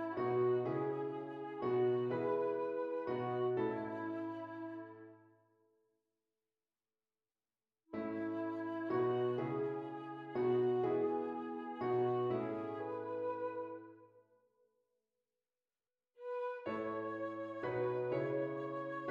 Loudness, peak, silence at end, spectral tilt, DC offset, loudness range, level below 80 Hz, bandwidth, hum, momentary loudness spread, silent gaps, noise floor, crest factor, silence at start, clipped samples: -39 LUFS; -24 dBFS; 0 s; -9.5 dB/octave; under 0.1%; 12 LU; -82 dBFS; 5.2 kHz; none; 11 LU; none; under -90 dBFS; 16 dB; 0 s; under 0.1%